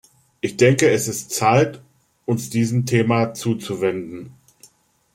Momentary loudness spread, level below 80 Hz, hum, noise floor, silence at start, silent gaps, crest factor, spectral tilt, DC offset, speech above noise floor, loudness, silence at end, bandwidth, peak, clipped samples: 13 LU; -58 dBFS; none; -56 dBFS; 0.45 s; none; 20 dB; -5.5 dB/octave; under 0.1%; 37 dB; -20 LUFS; 0.85 s; 16.5 kHz; 0 dBFS; under 0.1%